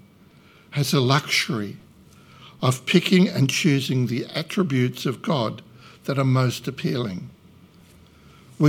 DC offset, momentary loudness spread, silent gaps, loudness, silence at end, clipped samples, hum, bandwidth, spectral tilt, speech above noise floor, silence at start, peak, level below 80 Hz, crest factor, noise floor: under 0.1%; 12 LU; none; -22 LUFS; 0 s; under 0.1%; none; 16.5 kHz; -5.5 dB/octave; 30 dB; 0.7 s; -2 dBFS; -64 dBFS; 22 dB; -52 dBFS